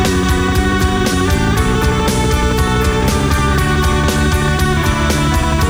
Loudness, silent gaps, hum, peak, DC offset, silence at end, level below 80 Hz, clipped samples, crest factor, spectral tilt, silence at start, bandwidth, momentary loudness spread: -14 LUFS; none; none; -2 dBFS; under 0.1%; 0 s; -18 dBFS; under 0.1%; 10 dB; -5 dB/octave; 0 s; over 20 kHz; 1 LU